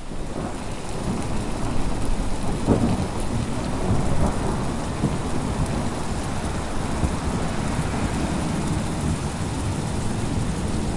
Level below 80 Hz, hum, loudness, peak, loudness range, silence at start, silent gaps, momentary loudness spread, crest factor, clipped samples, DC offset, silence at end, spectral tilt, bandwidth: -30 dBFS; none; -26 LUFS; -4 dBFS; 2 LU; 0 s; none; 4 LU; 18 dB; under 0.1%; under 0.1%; 0 s; -6 dB/octave; 11.5 kHz